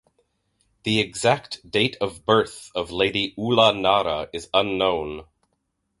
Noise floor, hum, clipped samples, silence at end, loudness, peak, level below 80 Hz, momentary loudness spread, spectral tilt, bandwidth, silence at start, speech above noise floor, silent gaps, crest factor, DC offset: -74 dBFS; none; under 0.1%; 0.75 s; -22 LUFS; -2 dBFS; -52 dBFS; 11 LU; -4.5 dB/octave; 11.5 kHz; 0.85 s; 52 dB; none; 22 dB; under 0.1%